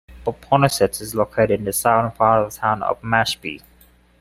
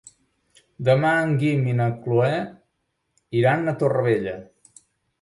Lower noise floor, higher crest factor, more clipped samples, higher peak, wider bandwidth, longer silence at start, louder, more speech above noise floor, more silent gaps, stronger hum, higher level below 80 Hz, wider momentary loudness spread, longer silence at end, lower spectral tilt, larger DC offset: second, -53 dBFS vs -74 dBFS; about the same, 18 dB vs 18 dB; neither; first, -2 dBFS vs -6 dBFS; first, 16 kHz vs 11.5 kHz; second, 0.1 s vs 0.8 s; first, -19 LUFS vs -22 LUFS; second, 34 dB vs 54 dB; neither; neither; first, -48 dBFS vs -60 dBFS; about the same, 11 LU vs 9 LU; second, 0.6 s vs 0.8 s; second, -4.5 dB/octave vs -8 dB/octave; neither